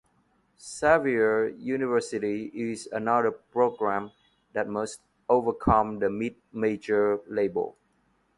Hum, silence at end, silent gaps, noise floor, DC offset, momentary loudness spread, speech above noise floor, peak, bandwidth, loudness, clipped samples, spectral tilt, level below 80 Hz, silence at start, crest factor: none; 0.65 s; none; -69 dBFS; under 0.1%; 10 LU; 42 dB; -6 dBFS; 11.5 kHz; -27 LUFS; under 0.1%; -6 dB/octave; -52 dBFS; 0.6 s; 22 dB